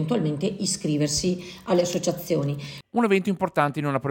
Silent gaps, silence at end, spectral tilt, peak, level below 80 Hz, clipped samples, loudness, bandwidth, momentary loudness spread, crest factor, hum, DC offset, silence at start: none; 0 s; -5 dB/octave; -6 dBFS; -54 dBFS; under 0.1%; -25 LUFS; 17 kHz; 6 LU; 18 dB; none; under 0.1%; 0 s